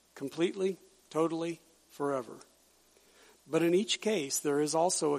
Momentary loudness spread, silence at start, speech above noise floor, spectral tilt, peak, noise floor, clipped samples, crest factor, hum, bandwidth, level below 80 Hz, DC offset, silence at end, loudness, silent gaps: 14 LU; 0.15 s; 34 dB; -3.5 dB/octave; -16 dBFS; -65 dBFS; under 0.1%; 16 dB; none; 15.5 kHz; -80 dBFS; under 0.1%; 0 s; -32 LUFS; none